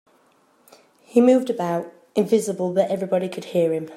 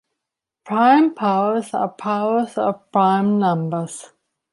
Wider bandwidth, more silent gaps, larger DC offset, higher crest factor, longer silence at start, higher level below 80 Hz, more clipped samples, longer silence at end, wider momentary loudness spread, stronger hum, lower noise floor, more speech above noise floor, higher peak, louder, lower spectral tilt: first, 14.5 kHz vs 11.5 kHz; neither; neither; about the same, 18 dB vs 16 dB; first, 1.15 s vs 0.65 s; about the same, -72 dBFS vs -70 dBFS; neither; second, 0 s vs 0.45 s; about the same, 9 LU vs 11 LU; neither; second, -60 dBFS vs -83 dBFS; second, 39 dB vs 65 dB; about the same, -4 dBFS vs -2 dBFS; about the same, -21 LUFS vs -19 LUFS; about the same, -6.5 dB/octave vs -6.5 dB/octave